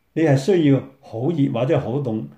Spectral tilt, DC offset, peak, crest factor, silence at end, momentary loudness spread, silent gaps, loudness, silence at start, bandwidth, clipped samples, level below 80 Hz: -8 dB/octave; under 0.1%; -6 dBFS; 14 dB; 0.05 s; 8 LU; none; -20 LUFS; 0.15 s; 9.8 kHz; under 0.1%; -60 dBFS